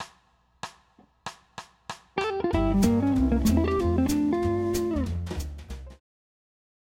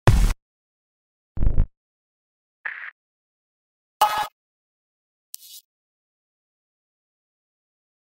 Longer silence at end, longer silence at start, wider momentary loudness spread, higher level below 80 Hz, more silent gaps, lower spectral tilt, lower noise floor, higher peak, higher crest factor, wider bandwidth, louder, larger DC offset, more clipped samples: second, 1.05 s vs 2.45 s; about the same, 0 s vs 0.05 s; about the same, 20 LU vs 20 LU; second, -36 dBFS vs -30 dBFS; second, none vs 0.42-1.35 s, 1.77-2.64 s, 2.92-4.00 s, 4.32-5.33 s; first, -6.5 dB/octave vs -5 dB/octave; second, -64 dBFS vs under -90 dBFS; second, -8 dBFS vs -2 dBFS; second, 18 dB vs 24 dB; about the same, 16 kHz vs 16 kHz; about the same, -25 LUFS vs -26 LUFS; neither; neither